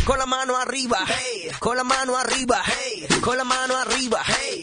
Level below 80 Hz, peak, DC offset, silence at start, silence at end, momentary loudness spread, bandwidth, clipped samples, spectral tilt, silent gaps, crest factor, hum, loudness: -42 dBFS; -6 dBFS; under 0.1%; 0 s; 0 s; 4 LU; 10.5 kHz; under 0.1%; -2 dB/octave; none; 18 dB; none; -22 LUFS